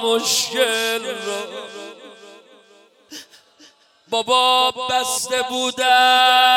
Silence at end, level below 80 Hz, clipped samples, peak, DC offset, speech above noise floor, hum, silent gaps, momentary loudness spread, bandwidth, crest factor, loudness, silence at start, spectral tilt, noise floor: 0 s; -70 dBFS; under 0.1%; -2 dBFS; under 0.1%; 34 dB; none; none; 24 LU; 17 kHz; 18 dB; -17 LUFS; 0 s; 0 dB/octave; -52 dBFS